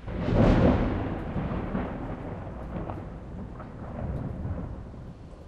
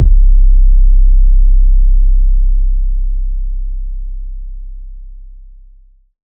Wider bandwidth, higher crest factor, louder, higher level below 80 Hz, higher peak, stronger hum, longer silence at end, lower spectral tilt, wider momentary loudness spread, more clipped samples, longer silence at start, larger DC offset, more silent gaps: first, 8 kHz vs 0.3 kHz; first, 20 dB vs 8 dB; second, -29 LUFS vs -15 LUFS; second, -36 dBFS vs -8 dBFS; second, -8 dBFS vs 0 dBFS; neither; second, 0 s vs 1.1 s; second, -9 dB/octave vs -16 dB/octave; about the same, 18 LU vs 19 LU; neither; about the same, 0 s vs 0 s; neither; neither